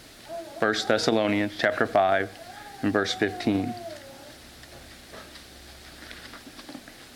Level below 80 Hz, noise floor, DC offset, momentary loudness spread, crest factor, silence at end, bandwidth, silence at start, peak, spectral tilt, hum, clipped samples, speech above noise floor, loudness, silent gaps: -58 dBFS; -47 dBFS; under 0.1%; 22 LU; 22 dB; 0 s; 18 kHz; 0 s; -8 dBFS; -4.5 dB/octave; none; under 0.1%; 22 dB; -25 LUFS; none